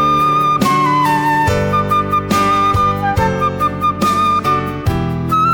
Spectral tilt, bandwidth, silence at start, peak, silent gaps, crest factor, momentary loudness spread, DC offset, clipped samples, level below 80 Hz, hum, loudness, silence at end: -5.5 dB/octave; 19.5 kHz; 0 s; -2 dBFS; none; 12 dB; 4 LU; under 0.1%; under 0.1%; -34 dBFS; none; -14 LUFS; 0 s